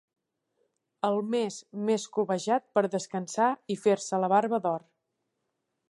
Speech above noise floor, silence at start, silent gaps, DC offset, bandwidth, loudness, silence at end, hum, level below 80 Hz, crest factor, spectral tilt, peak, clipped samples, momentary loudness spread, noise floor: 53 dB; 1.05 s; none; under 0.1%; 11.5 kHz; -29 LUFS; 1.1 s; none; -82 dBFS; 20 dB; -5 dB/octave; -10 dBFS; under 0.1%; 8 LU; -81 dBFS